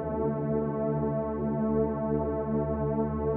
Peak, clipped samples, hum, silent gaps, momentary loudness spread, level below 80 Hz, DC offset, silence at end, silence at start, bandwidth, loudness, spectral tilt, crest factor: -16 dBFS; under 0.1%; none; none; 2 LU; -44 dBFS; under 0.1%; 0 s; 0 s; 3 kHz; -29 LUFS; -11.5 dB/octave; 14 dB